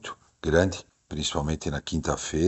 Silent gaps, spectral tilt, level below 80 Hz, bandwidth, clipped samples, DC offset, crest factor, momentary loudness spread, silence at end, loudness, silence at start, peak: none; -4.5 dB/octave; -40 dBFS; 8.2 kHz; under 0.1%; under 0.1%; 22 dB; 15 LU; 0 s; -28 LUFS; 0.05 s; -6 dBFS